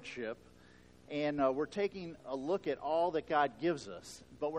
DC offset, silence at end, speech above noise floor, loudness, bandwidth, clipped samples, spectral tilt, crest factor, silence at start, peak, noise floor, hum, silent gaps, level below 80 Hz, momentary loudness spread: under 0.1%; 0 s; 25 dB; -36 LUFS; 13.5 kHz; under 0.1%; -5.5 dB/octave; 18 dB; 0 s; -18 dBFS; -61 dBFS; none; none; -68 dBFS; 14 LU